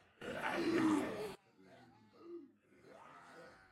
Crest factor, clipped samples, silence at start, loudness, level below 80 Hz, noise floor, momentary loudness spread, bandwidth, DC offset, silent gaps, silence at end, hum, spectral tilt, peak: 20 dB; under 0.1%; 0.2 s; -38 LUFS; -76 dBFS; -64 dBFS; 24 LU; 14 kHz; under 0.1%; none; 0.15 s; none; -5 dB/octave; -22 dBFS